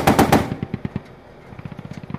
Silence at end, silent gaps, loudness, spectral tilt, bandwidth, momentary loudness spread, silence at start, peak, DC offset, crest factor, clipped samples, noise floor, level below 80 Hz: 0 s; none; -20 LUFS; -5.5 dB/octave; 15.5 kHz; 22 LU; 0 s; -2 dBFS; under 0.1%; 20 dB; under 0.1%; -42 dBFS; -40 dBFS